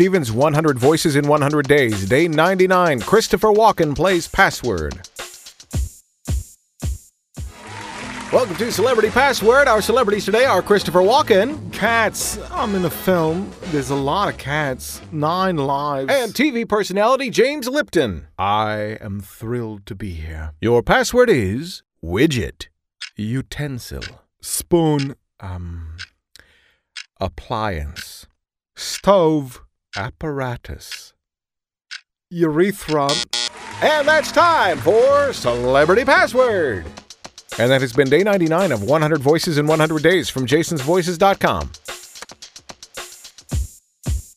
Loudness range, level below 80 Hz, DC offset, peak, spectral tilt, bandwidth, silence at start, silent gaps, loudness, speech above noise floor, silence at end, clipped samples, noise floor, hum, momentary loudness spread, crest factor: 9 LU; -38 dBFS; under 0.1%; 0 dBFS; -5 dB/octave; 15.5 kHz; 0 s; none; -17 LUFS; 71 dB; 0.1 s; under 0.1%; -89 dBFS; none; 19 LU; 18 dB